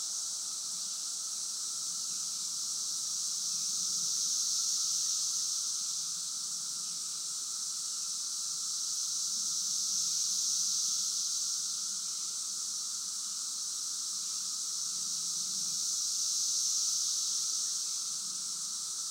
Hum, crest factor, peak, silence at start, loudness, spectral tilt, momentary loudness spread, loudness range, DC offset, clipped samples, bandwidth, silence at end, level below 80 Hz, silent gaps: none; 16 dB; -20 dBFS; 0 s; -31 LUFS; 3 dB/octave; 6 LU; 3 LU; under 0.1%; under 0.1%; 16 kHz; 0 s; under -90 dBFS; none